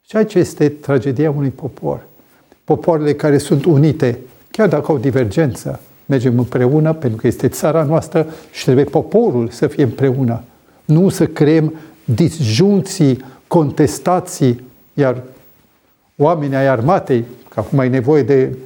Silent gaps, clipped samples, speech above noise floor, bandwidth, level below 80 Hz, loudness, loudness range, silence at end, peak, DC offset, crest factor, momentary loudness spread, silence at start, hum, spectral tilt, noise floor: none; under 0.1%; 42 dB; 18.5 kHz; -50 dBFS; -15 LUFS; 2 LU; 0 s; 0 dBFS; under 0.1%; 14 dB; 11 LU; 0.15 s; none; -7 dB/octave; -56 dBFS